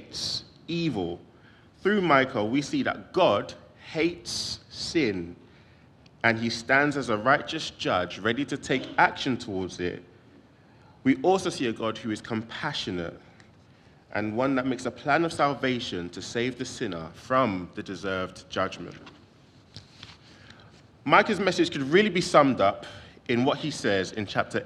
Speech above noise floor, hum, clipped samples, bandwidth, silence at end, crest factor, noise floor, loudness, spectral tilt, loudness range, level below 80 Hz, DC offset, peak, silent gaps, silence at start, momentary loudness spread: 29 dB; none; under 0.1%; 12.5 kHz; 0 s; 26 dB; -56 dBFS; -26 LUFS; -4.5 dB/octave; 7 LU; -62 dBFS; under 0.1%; -2 dBFS; none; 0 s; 13 LU